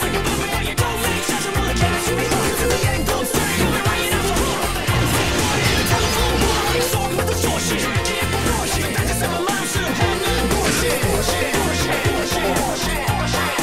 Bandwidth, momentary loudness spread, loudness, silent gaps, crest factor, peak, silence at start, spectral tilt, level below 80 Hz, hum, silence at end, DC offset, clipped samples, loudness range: 16 kHz; 3 LU; -19 LUFS; none; 16 dB; -4 dBFS; 0 s; -3.5 dB/octave; -30 dBFS; none; 0 s; under 0.1%; under 0.1%; 1 LU